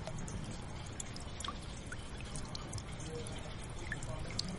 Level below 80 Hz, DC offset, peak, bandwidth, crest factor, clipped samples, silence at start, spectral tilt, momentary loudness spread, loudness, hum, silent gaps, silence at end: -48 dBFS; under 0.1%; -16 dBFS; 11.5 kHz; 28 dB; under 0.1%; 0 s; -4 dB/octave; 4 LU; -44 LUFS; none; none; 0 s